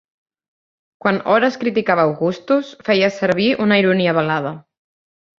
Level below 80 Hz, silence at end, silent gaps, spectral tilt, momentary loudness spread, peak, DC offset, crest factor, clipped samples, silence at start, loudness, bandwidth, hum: -60 dBFS; 0.8 s; none; -6.5 dB/octave; 7 LU; -2 dBFS; under 0.1%; 16 dB; under 0.1%; 1.05 s; -17 LUFS; 7.4 kHz; none